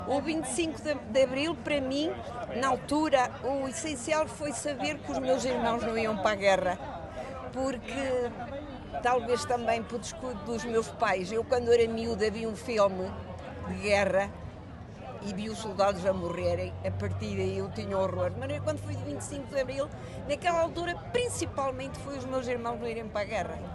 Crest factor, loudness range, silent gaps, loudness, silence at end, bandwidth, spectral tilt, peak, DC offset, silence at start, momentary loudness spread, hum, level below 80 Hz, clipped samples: 20 dB; 3 LU; none; -31 LUFS; 0 s; 12.5 kHz; -5 dB/octave; -10 dBFS; under 0.1%; 0 s; 11 LU; none; -52 dBFS; under 0.1%